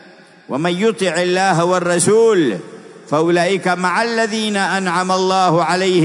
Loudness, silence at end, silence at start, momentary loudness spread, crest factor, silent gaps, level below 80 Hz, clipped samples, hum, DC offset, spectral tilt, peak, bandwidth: -15 LUFS; 0 s; 0.5 s; 6 LU; 14 dB; none; -68 dBFS; under 0.1%; none; under 0.1%; -4.5 dB/octave; -2 dBFS; 11 kHz